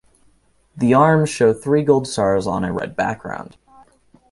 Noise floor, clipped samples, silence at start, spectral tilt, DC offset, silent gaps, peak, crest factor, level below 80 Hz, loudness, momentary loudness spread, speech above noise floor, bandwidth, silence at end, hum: -58 dBFS; under 0.1%; 0.75 s; -6.5 dB/octave; under 0.1%; none; -2 dBFS; 18 dB; -50 dBFS; -18 LUFS; 11 LU; 40 dB; 11.5 kHz; 0.9 s; none